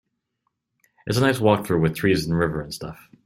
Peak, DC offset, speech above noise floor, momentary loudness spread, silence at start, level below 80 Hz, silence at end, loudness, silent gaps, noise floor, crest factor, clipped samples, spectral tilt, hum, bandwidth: -2 dBFS; under 0.1%; 55 dB; 15 LU; 1.05 s; -48 dBFS; 0.3 s; -21 LUFS; none; -76 dBFS; 20 dB; under 0.1%; -6 dB/octave; none; 16 kHz